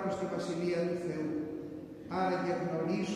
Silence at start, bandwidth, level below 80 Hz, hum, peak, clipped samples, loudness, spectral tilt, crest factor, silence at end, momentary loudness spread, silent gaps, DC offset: 0 s; 11.5 kHz; -68 dBFS; none; -20 dBFS; under 0.1%; -35 LUFS; -6.5 dB/octave; 14 dB; 0 s; 9 LU; none; under 0.1%